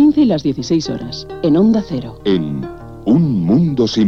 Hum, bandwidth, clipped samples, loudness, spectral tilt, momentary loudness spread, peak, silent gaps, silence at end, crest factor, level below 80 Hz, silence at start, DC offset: none; 7.2 kHz; under 0.1%; -16 LUFS; -7.5 dB/octave; 12 LU; -2 dBFS; none; 0 s; 12 dB; -42 dBFS; 0 s; 0.4%